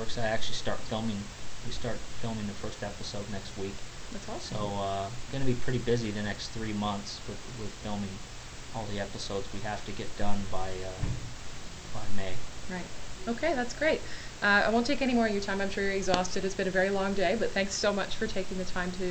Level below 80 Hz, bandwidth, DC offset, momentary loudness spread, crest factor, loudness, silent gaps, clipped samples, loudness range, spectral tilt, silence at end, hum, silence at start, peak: -44 dBFS; 9 kHz; under 0.1%; 13 LU; 20 dB; -32 LUFS; none; under 0.1%; 10 LU; -4.5 dB/octave; 0 s; none; 0 s; -8 dBFS